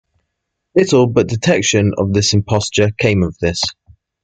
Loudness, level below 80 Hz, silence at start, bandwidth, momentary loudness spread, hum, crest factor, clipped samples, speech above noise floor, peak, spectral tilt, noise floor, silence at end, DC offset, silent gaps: -15 LUFS; -44 dBFS; 0.75 s; 9.4 kHz; 5 LU; none; 14 dB; under 0.1%; 61 dB; 0 dBFS; -5 dB/octave; -75 dBFS; 0.55 s; under 0.1%; none